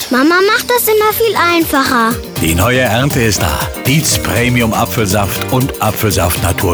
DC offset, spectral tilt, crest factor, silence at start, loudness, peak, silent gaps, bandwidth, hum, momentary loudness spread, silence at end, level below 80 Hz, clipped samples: under 0.1%; -4 dB/octave; 12 dB; 0 s; -12 LUFS; 0 dBFS; none; over 20 kHz; none; 4 LU; 0 s; -30 dBFS; under 0.1%